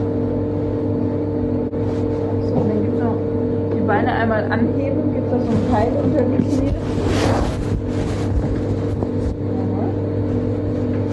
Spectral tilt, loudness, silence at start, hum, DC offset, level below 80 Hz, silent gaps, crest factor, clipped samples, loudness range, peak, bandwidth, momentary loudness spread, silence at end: -8 dB/octave; -20 LUFS; 0 s; none; under 0.1%; -32 dBFS; none; 16 dB; under 0.1%; 3 LU; -4 dBFS; 11 kHz; 4 LU; 0 s